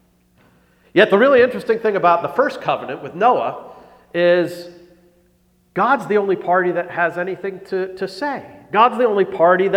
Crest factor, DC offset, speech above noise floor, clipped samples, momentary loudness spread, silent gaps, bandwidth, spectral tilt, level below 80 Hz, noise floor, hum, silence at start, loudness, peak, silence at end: 18 dB; under 0.1%; 41 dB; under 0.1%; 12 LU; none; 13.5 kHz; -6.5 dB/octave; -62 dBFS; -58 dBFS; none; 0.95 s; -17 LUFS; 0 dBFS; 0 s